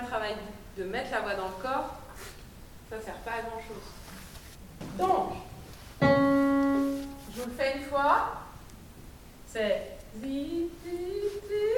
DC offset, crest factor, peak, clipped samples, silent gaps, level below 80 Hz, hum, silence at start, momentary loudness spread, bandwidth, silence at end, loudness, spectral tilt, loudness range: under 0.1%; 22 dB; -10 dBFS; under 0.1%; none; -50 dBFS; none; 0 s; 22 LU; 19 kHz; 0 s; -30 LUFS; -6 dB/octave; 10 LU